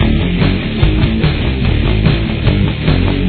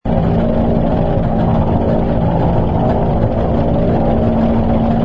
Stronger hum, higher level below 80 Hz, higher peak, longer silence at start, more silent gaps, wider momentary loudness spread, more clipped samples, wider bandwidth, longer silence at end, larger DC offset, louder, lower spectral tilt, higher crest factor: neither; about the same, -18 dBFS vs -20 dBFS; about the same, 0 dBFS vs 0 dBFS; about the same, 0 s vs 0.05 s; neither; about the same, 2 LU vs 1 LU; neither; second, 4.5 kHz vs 5.4 kHz; about the same, 0 s vs 0 s; neither; about the same, -14 LUFS vs -15 LUFS; about the same, -10.5 dB/octave vs -11 dB/octave; about the same, 12 dB vs 12 dB